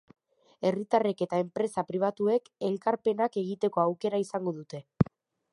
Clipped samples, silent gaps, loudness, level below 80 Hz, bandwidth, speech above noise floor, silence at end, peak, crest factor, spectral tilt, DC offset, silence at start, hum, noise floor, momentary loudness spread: under 0.1%; none; -29 LUFS; -60 dBFS; 11.5 kHz; 21 dB; 0.5 s; -8 dBFS; 22 dB; -7.5 dB/octave; under 0.1%; 0.6 s; none; -50 dBFS; 6 LU